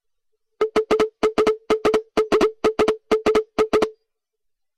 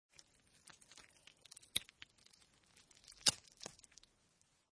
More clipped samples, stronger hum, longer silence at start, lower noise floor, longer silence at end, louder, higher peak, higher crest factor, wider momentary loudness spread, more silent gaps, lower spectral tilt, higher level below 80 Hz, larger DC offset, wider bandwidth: neither; neither; about the same, 0.6 s vs 0.65 s; about the same, -75 dBFS vs -76 dBFS; second, 0.85 s vs 1.05 s; first, -21 LUFS vs -39 LUFS; about the same, -10 dBFS vs -10 dBFS; second, 12 dB vs 38 dB; second, 3 LU vs 27 LU; neither; first, -4.5 dB/octave vs 0.5 dB/octave; first, -48 dBFS vs -78 dBFS; neither; first, 12.5 kHz vs 11 kHz